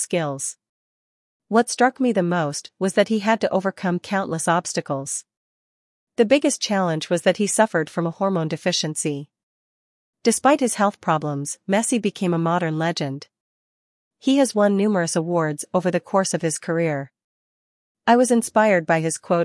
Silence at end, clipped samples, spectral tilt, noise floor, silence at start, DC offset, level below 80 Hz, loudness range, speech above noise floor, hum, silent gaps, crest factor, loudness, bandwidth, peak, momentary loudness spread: 0 s; under 0.1%; -4.5 dB/octave; under -90 dBFS; 0 s; under 0.1%; -72 dBFS; 2 LU; over 69 dB; none; 0.69-1.40 s, 5.37-6.07 s, 9.43-10.13 s, 13.40-14.11 s, 17.24-17.95 s; 20 dB; -21 LUFS; 12 kHz; -2 dBFS; 9 LU